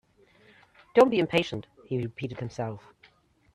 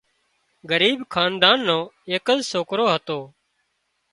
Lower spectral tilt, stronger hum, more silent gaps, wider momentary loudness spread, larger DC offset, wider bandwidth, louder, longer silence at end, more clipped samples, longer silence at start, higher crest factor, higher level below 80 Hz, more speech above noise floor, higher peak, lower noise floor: first, -6.5 dB/octave vs -3.5 dB/octave; neither; neither; first, 15 LU vs 10 LU; neither; about the same, 12 kHz vs 11.5 kHz; second, -27 LUFS vs -20 LUFS; about the same, 0.75 s vs 0.85 s; neither; first, 0.95 s vs 0.65 s; about the same, 22 dB vs 22 dB; about the same, -64 dBFS vs -64 dBFS; second, 36 dB vs 51 dB; second, -8 dBFS vs 0 dBFS; second, -62 dBFS vs -72 dBFS